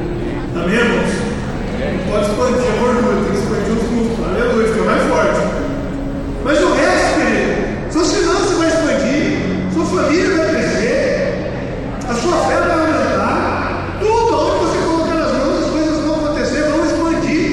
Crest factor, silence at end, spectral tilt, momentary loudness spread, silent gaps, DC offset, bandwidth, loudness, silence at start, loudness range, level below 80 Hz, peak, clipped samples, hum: 14 dB; 0 s; -5.5 dB/octave; 7 LU; none; under 0.1%; 16.5 kHz; -16 LUFS; 0 s; 2 LU; -30 dBFS; -2 dBFS; under 0.1%; none